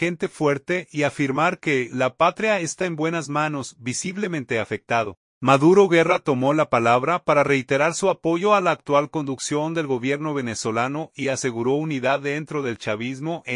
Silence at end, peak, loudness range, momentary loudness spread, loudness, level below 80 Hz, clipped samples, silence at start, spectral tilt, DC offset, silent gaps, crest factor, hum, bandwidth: 0 s; -2 dBFS; 6 LU; 8 LU; -22 LUFS; -64 dBFS; under 0.1%; 0 s; -5 dB/octave; under 0.1%; 5.17-5.41 s; 18 dB; none; 11 kHz